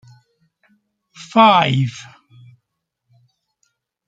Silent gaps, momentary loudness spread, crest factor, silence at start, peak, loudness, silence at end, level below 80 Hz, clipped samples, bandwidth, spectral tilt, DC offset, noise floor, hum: none; 26 LU; 20 dB; 1.2 s; 0 dBFS; -14 LUFS; 2.05 s; -62 dBFS; under 0.1%; 7.8 kHz; -6 dB/octave; under 0.1%; -76 dBFS; none